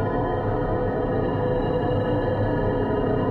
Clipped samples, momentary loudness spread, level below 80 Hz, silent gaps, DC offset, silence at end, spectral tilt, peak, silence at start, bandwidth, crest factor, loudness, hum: under 0.1%; 1 LU; -34 dBFS; none; under 0.1%; 0 s; -10 dB/octave; -12 dBFS; 0 s; 4.6 kHz; 12 dB; -24 LUFS; none